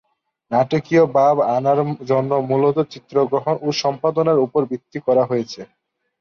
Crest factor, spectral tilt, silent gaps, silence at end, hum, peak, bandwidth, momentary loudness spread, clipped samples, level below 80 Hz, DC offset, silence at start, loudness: 14 dB; -6.5 dB/octave; none; 0.55 s; none; -4 dBFS; 7 kHz; 7 LU; under 0.1%; -64 dBFS; under 0.1%; 0.5 s; -18 LUFS